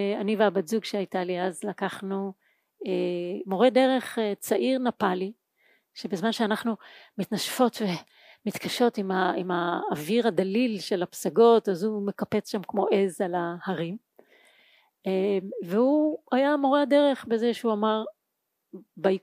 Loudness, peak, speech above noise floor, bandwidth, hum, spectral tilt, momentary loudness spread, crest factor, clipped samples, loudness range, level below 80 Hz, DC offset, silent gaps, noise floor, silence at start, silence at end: -26 LUFS; -8 dBFS; 55 dB; 15.5 kHz; none; -5.5 dB/octave; 11 LU; 18 dB; under 0.1%; 5 LU; -80 dBFS; under 0.1%; none; -80 dBFS; 0 s; 0.05 s